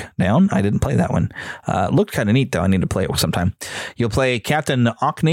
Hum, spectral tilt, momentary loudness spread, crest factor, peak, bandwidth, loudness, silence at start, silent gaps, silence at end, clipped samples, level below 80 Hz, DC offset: none; -6 dB/octave; 7 LU; 12 dB; -6 dBFS; 16.5 kHz; -19 LUFS; 0 s; none; 0 s; under 0.1%; -40 dBFS; under 0.1%